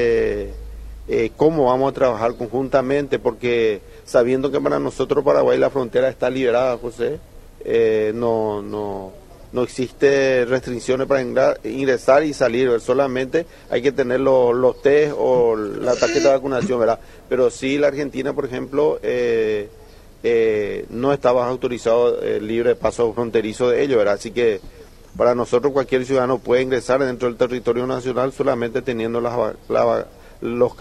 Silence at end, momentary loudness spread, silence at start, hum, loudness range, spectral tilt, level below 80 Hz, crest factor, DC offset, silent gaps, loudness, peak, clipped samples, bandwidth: 0.05 s; 9 LU; 0 s; none; 3 LU; -6 dB/octave; -44 dBFS; 18 dB; under 0.1%; none; -19 LUFS; -2 dBFS; under 0.1%; 13 kHz